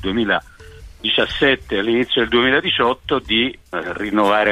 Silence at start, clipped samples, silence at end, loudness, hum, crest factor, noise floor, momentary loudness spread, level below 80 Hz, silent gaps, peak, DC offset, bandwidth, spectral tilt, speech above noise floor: 0 s; under 0.1%; 0 s; -18 LUFS; none; 16 dB; -39 dBFS; 7 LU; -42 dBFS; none; -2 dBFS; under 0.1%; 13 kHz; -5 dB/octave; 21 dB